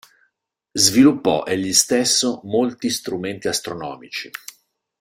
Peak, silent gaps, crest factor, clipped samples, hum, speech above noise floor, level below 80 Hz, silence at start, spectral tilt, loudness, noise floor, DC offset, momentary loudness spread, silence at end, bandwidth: 0 dBFS; none; 20 dB; under 0.1%; none; 53 dB; -58 dBFS; 0.75 s; -2.5 dB/octave; -18 LUFS; -73 dBFS; under 0.1%; 15 LU; 0.7 s; 16.5 kHz